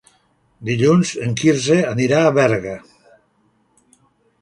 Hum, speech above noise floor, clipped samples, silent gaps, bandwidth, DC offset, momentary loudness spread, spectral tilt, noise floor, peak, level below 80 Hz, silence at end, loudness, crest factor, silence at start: none; 45 dB; under 0.1%; none; 11.5 kHz; under 0.1%; 13 LU; -5.5 dB/octave; -61 dBFS; 0 dBFS; -54 dBFS; 1.65 s; -16 LUFS; 18 dB; 0.6 s